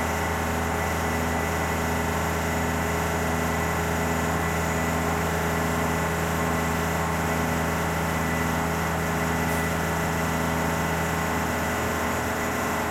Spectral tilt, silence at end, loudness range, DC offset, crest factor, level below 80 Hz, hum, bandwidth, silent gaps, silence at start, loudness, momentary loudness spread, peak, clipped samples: -5 dB/octave; 0 s; 0 LU; under 0.1%; 14 dB; -42 dBFS; none; 16.5 kHz; none; 0 s; -25 LUFS; 1 LU; -12 dBFS; under 0.1%